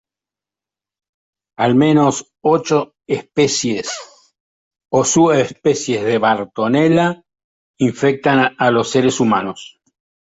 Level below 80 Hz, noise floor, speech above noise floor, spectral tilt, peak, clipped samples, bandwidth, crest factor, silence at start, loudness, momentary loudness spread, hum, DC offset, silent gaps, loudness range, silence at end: -56 dBFS; -88 dBFS; 73 dB; -5 dB/octave; -2 dBFS; under 0.1%; 8 kHz; 16 dB; 1.6 s; -16 LUFS; 10 LU; none; under 0.1%; 4.40-4.71 s, 7.44-7.74 s; 2 LU; 0.65 s